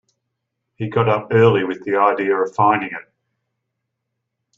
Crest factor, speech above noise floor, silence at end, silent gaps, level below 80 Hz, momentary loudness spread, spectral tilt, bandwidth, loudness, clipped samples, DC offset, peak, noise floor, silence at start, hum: 18 dB; 61 dB; 1.55 s; none; -60 dBFS; 12 LU; -8 dB/octave; 7.4 kHz; -17 LUFS; under 0.1%; under 0.1%; -2 dBFS; -78 dBFS; 0.8 s; none